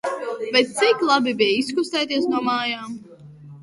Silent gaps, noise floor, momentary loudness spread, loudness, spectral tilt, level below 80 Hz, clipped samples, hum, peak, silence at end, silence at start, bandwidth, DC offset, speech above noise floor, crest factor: none; -43 dBFS; 11 LU; -20 LUFS; -3 dB/octave; -68 dBFS; under 0.1%; none; -4 dBFS; 0 s; 0.05 s; 11.5 kHz; under 0.1%; 22 dB; 18 dB